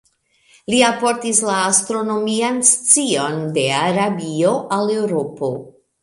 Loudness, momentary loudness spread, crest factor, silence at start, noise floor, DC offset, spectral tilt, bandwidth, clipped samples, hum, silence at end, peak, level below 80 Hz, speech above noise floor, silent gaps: -17 LUFS; 8 LU; 18 dB; 0.7 s; -57 dBFS; under 0.1%; -3 dB/octave; 16 kHz; under 0.1%; none; 0.35 s; 0 dBFS; -62 dBFS; 40 dB; none